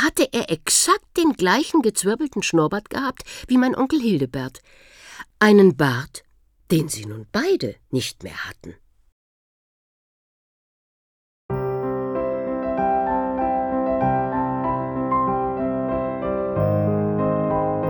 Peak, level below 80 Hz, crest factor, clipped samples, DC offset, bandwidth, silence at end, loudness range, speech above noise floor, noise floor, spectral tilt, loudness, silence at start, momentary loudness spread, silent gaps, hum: -2 dBFS; -48 dBFS; 20 dB; under 0.1%; under 0.1%; 20 kHz; 0 s; 12 LU; 22 dB; -42 dBFS; -4.5 dB/octave; -21 LUFS; 0 s; 13 LU; 9.12-11.49 s; none